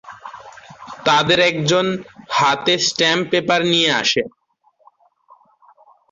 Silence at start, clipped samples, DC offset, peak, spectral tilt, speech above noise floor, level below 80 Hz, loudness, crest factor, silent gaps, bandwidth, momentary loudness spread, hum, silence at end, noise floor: 0.05 s; under 0.1%; under 0.1%; -4 dBFS; -3 dB/octave; 43 dB; -58 dBFS; -16 LUFS; 16 dB; none; 8 kHz; 17 LU; none; 1.85 s; -60 dBFS